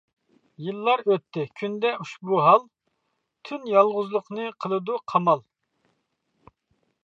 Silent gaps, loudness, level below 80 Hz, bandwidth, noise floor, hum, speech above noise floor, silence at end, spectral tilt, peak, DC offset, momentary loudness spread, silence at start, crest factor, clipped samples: none; -24 LUFS; -78 dBFS; 7.6 kHz; -76 dBFS; none; 53 dB; 1.65 s; -7 dB/octave; -4 dBFS; under 0.1%; 14 LU; 0.6 s; 22 dB; under 0.1%